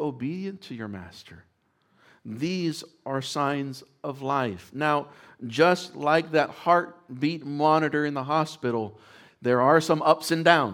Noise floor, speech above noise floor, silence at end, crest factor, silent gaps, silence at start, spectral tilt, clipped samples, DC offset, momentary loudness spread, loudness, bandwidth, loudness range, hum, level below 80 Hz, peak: -67 dBFS; 42 dB; 0 s; 24 dB; none; 0 s; -5.5 dB/octave; under 0.1%; under 0.1%; 17 LU; -25 LUFS; 17.5 kHz; 8 LU; none; -72 dBFS; -2 dBFS